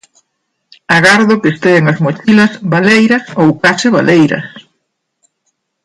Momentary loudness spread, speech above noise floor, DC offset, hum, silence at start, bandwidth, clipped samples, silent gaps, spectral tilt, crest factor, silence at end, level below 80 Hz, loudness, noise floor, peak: 6 LU; 59 dB; under 0.1%; none; 0.9 s; 11.5 kHz; under 0.1%; none; -5.5 dB/octave; 12 dB; 1.25 s; -52 dBFS; -9 LUFS; -68 dBFS; 0 dBFS